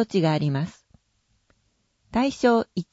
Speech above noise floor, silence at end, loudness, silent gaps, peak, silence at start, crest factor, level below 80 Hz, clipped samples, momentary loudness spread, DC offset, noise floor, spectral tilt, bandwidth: 47 dB; 0.1 s; -24 LUFS; none; -6 dBFS; 0 s; 18 dB; -56 dBFS; under 0.1%; 8 LU; under 0.1%; -70 dBFS; -7 dB/octave; 8 kHz